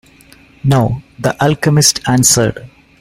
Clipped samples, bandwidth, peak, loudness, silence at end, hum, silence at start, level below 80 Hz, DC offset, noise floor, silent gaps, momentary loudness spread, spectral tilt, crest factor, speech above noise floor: under 0.1%; 16.5 kHz; 0 dBFS; -12 LUFS; 0.35 s; none; 0.65 s; -40 dBFS; under 0.1%; -44 dBFS; none; 10 LU; -4 dB/octave; 14 dB; 31 dB